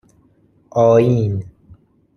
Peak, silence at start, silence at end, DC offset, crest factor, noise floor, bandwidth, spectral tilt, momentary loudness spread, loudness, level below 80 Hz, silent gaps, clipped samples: -2 dBFS; 0.75 s; 0.65 s; under 0.1%; 16 dB; -55 dBFS; 6.8 kHz; -9 dB/octave; 12 LU; -16 LUFS; -52 dBFS; none; under 0.1%